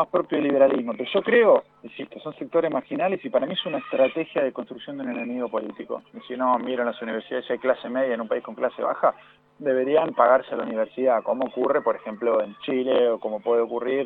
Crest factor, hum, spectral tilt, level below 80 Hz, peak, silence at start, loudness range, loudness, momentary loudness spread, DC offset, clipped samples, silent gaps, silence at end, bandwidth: 20 dB; none; -8.5 dB/octave; -74 dBFS; -4 dBFS; 0 s; 4 LU; -24 LUFS; 14 LU; under 0.1%; under 0.1%; none; 0 s; 4.1 kHz